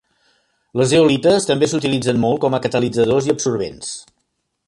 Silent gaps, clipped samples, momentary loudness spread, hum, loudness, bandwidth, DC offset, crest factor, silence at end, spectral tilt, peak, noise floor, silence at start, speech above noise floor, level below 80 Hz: none; under 0.1%; 13 LU; none; -17 LUFS; 11.5 kHz; under 0.1%; 16 dB; 0.65 s; -5 dB/octave; -2 dBFS; -71 dBFS; 0.75 s; 55 dB; -52 dBFS